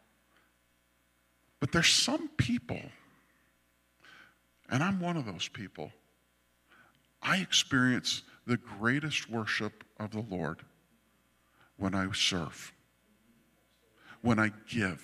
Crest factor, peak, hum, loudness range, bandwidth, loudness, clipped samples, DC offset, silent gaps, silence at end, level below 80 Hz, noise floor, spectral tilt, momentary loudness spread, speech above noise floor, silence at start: 24 dB; -10 dBFS; 60 Hz at -60 dBFS; 7 LU; 15 kHz; -31 LUFS; under 0.1%; under 0.1%; none; 0 s; -62 dBFS; -72 dBFS; -3.5 dB/octave; 16 LU; 40 dB; 1.6 s